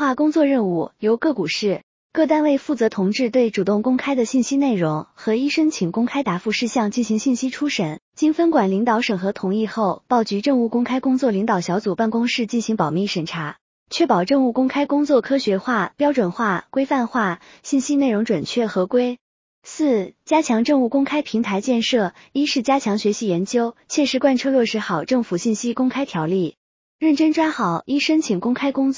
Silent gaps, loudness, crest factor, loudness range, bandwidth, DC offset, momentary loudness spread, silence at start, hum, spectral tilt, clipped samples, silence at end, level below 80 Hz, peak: 1.83-2.10 s, 8.02-8.12 s, 13.61-13.86 s, 19.21-19.62 s, 26.57-26.99 s; -20 LUFS; 16 dB; 1 LU; 7.6 kHz; under 0.1%; 5 LU; 0 s; none; -5 dB/octave; under 0.1%; 0 s; -64 dBFS; -4 dBFS